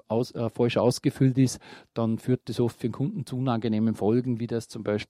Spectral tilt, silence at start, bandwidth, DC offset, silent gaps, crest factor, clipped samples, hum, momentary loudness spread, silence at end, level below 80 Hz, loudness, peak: -7 dB/octave; 0.1 s; 14.5 kHz; under 0.1%; none; 18 dB; under 0.1%; none; 8 LU; 0.05 s; -64 dBFS; -27 LUFS; -10 dBFS